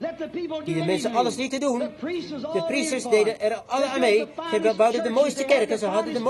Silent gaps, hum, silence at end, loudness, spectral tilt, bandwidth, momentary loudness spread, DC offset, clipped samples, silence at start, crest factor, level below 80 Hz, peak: none; none; 0 s; -24 LUFS; -4 dB/octave; 12.5 kHz; 10 LU; under 0.1%; under 0.1%; 0 s; 16 dB; -64 dBFS; -6 dBFS